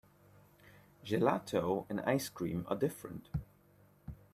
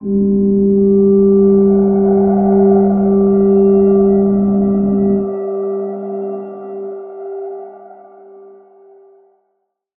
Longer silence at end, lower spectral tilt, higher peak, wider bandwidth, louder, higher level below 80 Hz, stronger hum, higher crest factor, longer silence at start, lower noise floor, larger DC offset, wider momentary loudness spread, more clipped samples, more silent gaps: second, 0.15 s vs 2.05 s; second, -6 dB/octave vs -16 dB/octave; second, -14 dBFS vs -2 dBFS; first, 15.5 kHz vs 2.1 kHz; second, -36 LUFS vs -12 LUFS; second, -60 dBFS vs -42 dBFS; neither; first, 24 dB vs 12 dB; first, 0.65 s vs 0 s; about the same, -65 dBFS vs -68 dBFS; neither; first, 20 LU vs 16 LU; neither; neither